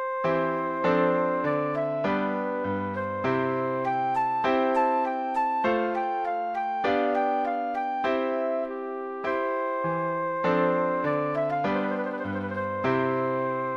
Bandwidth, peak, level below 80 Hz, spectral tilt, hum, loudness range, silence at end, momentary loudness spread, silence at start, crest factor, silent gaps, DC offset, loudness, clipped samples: 7.2 kHz; -12 dBFS; -64 dBFS; -7.5 dB/octave; none; 2 LU; 0 s; 6 LU; 0 s; 16 dB; none; under 0.1%; -27 LUFS; under 0.1%